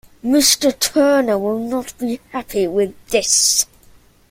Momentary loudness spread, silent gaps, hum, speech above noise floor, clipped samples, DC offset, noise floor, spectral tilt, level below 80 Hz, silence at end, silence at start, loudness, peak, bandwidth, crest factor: 12 LU; none; none; 32 dB; under 0.1%; under 0.1%; -49 dBFS; -2 dB/octave; -50 dBFS; 0.65 s; 0.25 s; -16 LUFS; 0 dBFS; 16.5 kHz; 16 dB